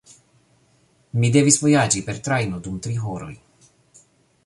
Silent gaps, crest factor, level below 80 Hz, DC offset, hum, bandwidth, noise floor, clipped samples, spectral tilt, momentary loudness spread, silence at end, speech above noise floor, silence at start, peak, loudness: none; 22 dB; -52 dBFS; under 0.1%; none; 11.5 kHz; -60 dBFS; under 0.1%; -4.5 dB/octave; 15 LU; 1.1 s; 40 dB; 1.15 s; -2 dBFS; -20 LUFS